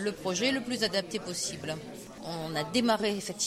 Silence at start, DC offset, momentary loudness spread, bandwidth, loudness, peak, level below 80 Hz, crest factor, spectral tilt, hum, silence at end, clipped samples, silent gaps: 0 s; under 0.1%; 12 LU; 16 kHz; -31 LUFS; -12 dBFS; -64 dBFS; 18 dB; -3 dB/octave; none; 0 s; under 0.1%; none